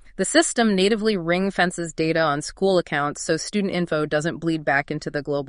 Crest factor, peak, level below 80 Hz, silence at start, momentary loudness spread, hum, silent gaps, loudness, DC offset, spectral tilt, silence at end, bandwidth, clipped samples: 20 dB; -2 dBFS; -52 dBFS; 0.05 s; 6 LU; none; none; -22 LUFS; under 0.1%; -4.5 dB/octave; 0 s; 11 kHz; under 0.1%